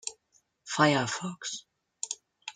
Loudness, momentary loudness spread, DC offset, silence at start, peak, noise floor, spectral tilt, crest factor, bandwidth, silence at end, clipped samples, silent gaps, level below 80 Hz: -30 LUFS; 16 LU; under 0.1%; 0.05 s; -10 dBFS; -70 dBFS; -3.5 dB/octave; 22 dB; 9.6 kHz; 0.05 s; under 0.1%; none; -74 dBFS